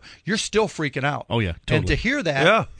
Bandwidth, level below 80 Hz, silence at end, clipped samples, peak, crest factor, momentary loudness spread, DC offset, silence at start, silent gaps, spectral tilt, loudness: 10.5 kHz; -38 dBFS; 0 s; under 0.1%; -4 dBFS; 18 dB; 7 LU; under 0.1%; 0.05 s; none; -5 dB/octave; -22 LUFS